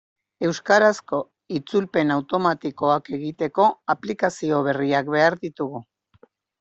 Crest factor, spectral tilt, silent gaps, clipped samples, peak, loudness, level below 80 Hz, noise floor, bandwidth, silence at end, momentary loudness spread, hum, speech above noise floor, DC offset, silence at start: 20 dB; -5.5 dB/octave; none; under 0.1%; -4 dBFS; -22 LUFS; -66 dBFS; -58 dBFS; 8.2 kHz; 0.8 s; 11 LU; none; 36 dB; under 0.1%; 0.4 s